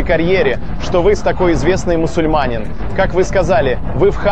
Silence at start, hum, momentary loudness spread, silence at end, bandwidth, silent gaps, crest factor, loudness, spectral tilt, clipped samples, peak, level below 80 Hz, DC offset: 0 s; none; 5 LU; 0 s; 8.8 kHz; none; 12 dB; -15 LUFS; -6.5 dB/octave; under 0.1%; 0 dBFS; -24 dBFS; 9%